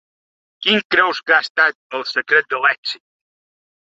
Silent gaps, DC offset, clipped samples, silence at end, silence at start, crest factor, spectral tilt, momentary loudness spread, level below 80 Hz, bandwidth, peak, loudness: 0.85-0.90 s, 1.50-1.55 s, 1.75-1.90 s, 2.78-2.83 s; under 0.1%; under 0.1%; 1 s; 0.6 s; 18 dB; -3.5 dB/octave; 11 LU; -70 dBFS; 7.8 kHz; 0 dBFS; -17 LUFS